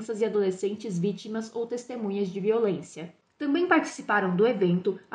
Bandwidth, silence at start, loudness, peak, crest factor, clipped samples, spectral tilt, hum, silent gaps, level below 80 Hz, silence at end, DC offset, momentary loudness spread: 10 kHz; 0 s; -27 LUFS; -8 dBFS; 18 dB; under 0.1%; -6.5 dB/octave; none; none; -76 dBFS; 0.15 s; under 0.1%; 11 LU